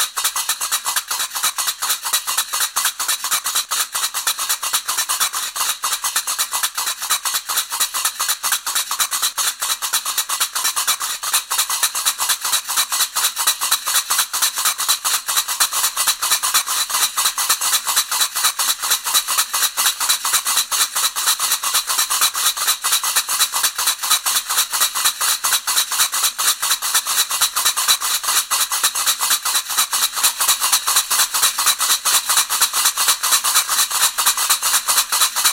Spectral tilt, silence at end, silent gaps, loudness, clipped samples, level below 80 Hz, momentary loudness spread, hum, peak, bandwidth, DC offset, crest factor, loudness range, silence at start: 4 dB/octave; 0 s; none; -16 LUFS; under 0.1%; -60 dBFS; 5 LU; none; 0 dBFS; 17 kHz; under 0.1%; 20 dB; 4 LU; 0 s